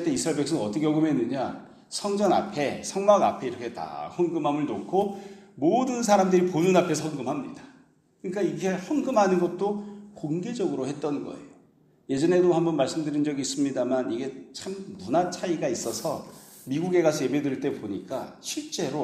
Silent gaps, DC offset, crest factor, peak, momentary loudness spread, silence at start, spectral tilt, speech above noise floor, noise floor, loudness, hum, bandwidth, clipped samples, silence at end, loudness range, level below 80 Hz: none; under 0.1%; 20 dB; -6 dBFS; 14 LU; 0 s; -5.5 dB/octave; 34 dB; -60 dBFS; -26 LUFS; none; 15 kHz; under 0.1%; 0 s; 4 LU; -68 dBFS